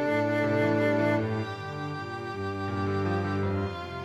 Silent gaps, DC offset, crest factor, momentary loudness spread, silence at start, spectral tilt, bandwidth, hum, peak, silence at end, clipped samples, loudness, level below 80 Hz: none; under 0.1%; 14 dB; 10 LU; 0 s; -7.5 dB/octave; 12.5 kHz; none; -14 dBFS; 0 s; under 0.1%; -29 LUFS; -60 dBFS